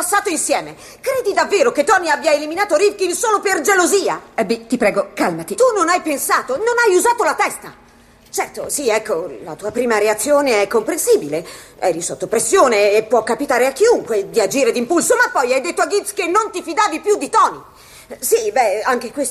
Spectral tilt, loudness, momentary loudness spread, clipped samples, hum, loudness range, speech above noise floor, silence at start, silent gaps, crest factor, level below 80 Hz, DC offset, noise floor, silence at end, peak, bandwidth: -2.5 dB/octave; -16 LUFS; 8 LU; under 0.1%; none; 3 LU; 31 dB; 0 s; none; 14 dB; -56 dBFS; under 0.1%; -47 dBFS; 0 s; -2 dBFS; 14 kHz